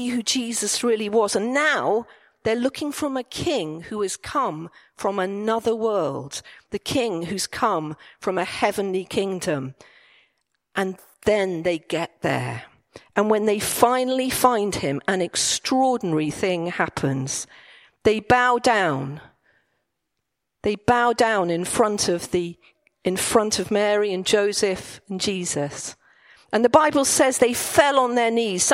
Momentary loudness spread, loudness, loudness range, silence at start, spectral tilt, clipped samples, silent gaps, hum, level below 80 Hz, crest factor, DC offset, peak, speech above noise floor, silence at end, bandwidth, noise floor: 11 LU; -22 LUFS; 5 LU; 0 s; -3.5 dB/octave; under 0.1%; none; none; -54 dBFS; 22 dB; under 0.1%; 0 dBFS; 58 dB; 0 s; 16 kHz; -80 dBFS